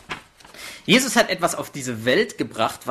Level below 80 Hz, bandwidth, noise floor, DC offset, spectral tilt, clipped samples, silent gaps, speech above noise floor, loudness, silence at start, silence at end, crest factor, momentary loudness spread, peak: -58 dBFS; 13.5 kHz; -43 dBFS; under 0.1%; -3 dB/octave; under 0.1%; none; 21 dB; -21 LUFS; 0.1 s; 0 s; 20 dB; 19 LU; -2 dBFS